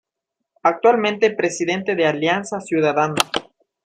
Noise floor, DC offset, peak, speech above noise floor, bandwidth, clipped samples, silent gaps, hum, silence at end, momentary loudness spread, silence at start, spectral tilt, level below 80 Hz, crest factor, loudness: -81 dBFS; under 0.1%; 0 dBFS; 62 dB; 15.5 kHz; under 0.1%; none; none; 0.45 s; 6 LU; 0.65 s; -4 dB/octave; -64 dBFS; 20 dB; -19 LUFS